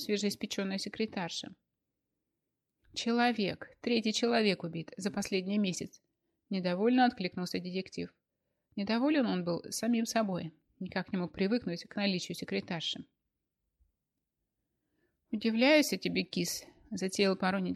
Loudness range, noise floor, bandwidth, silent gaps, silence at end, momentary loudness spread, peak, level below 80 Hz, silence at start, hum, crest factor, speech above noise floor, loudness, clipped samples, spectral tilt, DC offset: 5 LU; -87 dBFS; 15.5 kHz; none; 0 s; 13 LU; -14 dBFS; -72 dBFS; 0 s; none; 20 dB; 54 dB; -32 LUFS; under 0.1%; -4.5 dB/octave; under 0.1%